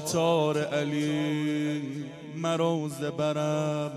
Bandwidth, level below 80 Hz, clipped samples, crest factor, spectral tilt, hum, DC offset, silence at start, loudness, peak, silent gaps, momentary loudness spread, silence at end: 15 kHz; -72 dBFS; under 0.1%; 16 dB; -5.5 dB/octave; none; under 0.1%; 0 s; -28 LUFS; -12 dBFS; none; 8 LU; 0 s